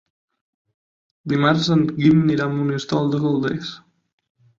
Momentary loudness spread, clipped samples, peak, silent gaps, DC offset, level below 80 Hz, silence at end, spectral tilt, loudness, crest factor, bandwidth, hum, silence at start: 10 LU; under 0.1%; -4 dBFS; none; under 0.1%; -58 dBFS; 0.85 s; -7 dB/octave; -19 LUFS; 18 dB; 7.6 kHz; none; 1.25 s